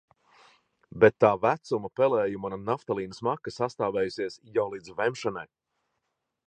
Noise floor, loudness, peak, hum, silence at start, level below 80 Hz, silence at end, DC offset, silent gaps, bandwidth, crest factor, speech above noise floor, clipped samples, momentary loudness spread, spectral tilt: -81 dBFS; -27 LUFS; -6 dBFS; none; 0.95 s; -64 dBFS; 1 s; under 0.1%; none; 9.2 kHz; 22 dB; 54 dB; under 0.1%; 12 LU; -6 dB/octave